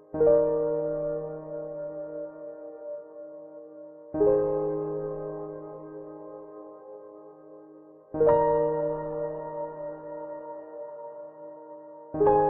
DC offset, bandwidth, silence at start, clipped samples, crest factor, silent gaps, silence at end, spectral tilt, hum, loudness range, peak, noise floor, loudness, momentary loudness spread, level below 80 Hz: under 0.1%; 3 kHz; 0 s; under 0.1%; 20 dB; none; 0 s; -4.5 dB/octave; none; 9 LU; -10 dBFS; -51 dBFS; -28 LUFS; 22 LU; -56 dBFS